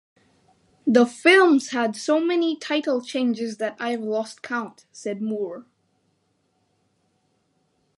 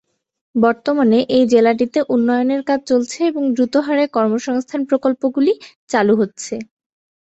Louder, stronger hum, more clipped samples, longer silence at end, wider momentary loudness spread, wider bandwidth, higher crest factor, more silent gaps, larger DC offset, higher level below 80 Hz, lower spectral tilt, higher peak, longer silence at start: second, -22 LUFS vs -17 LUFS; neither; neither; first, 2.35 s vs 0.55 s; first, 14 LU vs 8 LU; first, 11.5 kHz vs 8.2 kHz; first, 22 dB vs 16 dB; second, none vs 5.75-5.87 s; neither; second, -80 dBFS vs -60 dBFS; second, -4 dB/octave vs -5.5 dB/octave; about the same, -2 dBFS vs -2 dBFS; first, 0.85 s vs 0.55 s